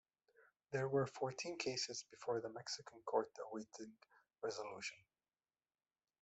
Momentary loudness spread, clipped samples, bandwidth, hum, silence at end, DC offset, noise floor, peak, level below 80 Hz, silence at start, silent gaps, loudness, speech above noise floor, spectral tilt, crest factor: 10 LU; under 0.1%; 8.2 kHz; none; 1.25 s; under 0.1%; under -90 dBFS; -24 dBFS; -84 dBFS; 0.4 s; none; -44 LUFS; over 46 dB; -4 dB/octave; 22 dB